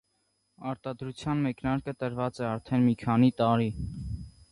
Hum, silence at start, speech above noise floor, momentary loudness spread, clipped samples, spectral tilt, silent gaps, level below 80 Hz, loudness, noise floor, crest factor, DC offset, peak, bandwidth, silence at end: none; 0.6 s; 47 dB; 14 LU; under 0.1%; -8 dB/octave; none; -50 dBFS; -29 LUFS; -75 dBFS; 18 dB; under 0.1%; -12 dBFS; 10.5 kHz; 0.2 s